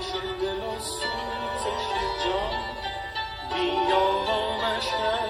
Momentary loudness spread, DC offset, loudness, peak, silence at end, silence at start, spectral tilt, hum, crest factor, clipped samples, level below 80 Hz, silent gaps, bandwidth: 8 LU; under 0.1%; -27 LUFS; -10 dBFS; 0 s; 0 s; -3.5 dB/octave; none; 16 dB; under 0.1%; -46 dBFS; none; 15 kHz